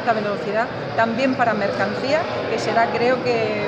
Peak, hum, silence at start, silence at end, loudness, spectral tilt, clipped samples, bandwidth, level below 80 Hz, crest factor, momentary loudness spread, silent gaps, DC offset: -4 dBFS; none; 0 s; 0 s; -20 LUFS; -5.5 dB/octave; under 0.1%; 8.8 kHz; -56 dBFS; 16 dB; 4 LU; none; under 0.1%